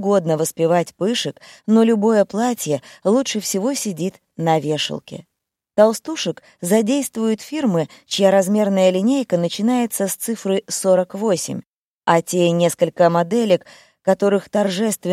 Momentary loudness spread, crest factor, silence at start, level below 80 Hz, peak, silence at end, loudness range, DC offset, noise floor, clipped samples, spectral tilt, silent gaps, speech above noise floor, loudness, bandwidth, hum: 9 LU; 18 dB; 0 s; -68 dBFS; 0 dBFS; 0 s; 3 LU; under 0.1%; -53 dBFS; under 0.1%; -5 dB/octave; 11.66-11.99 s; 35 dB; -19 LUFS; 16 kHz; none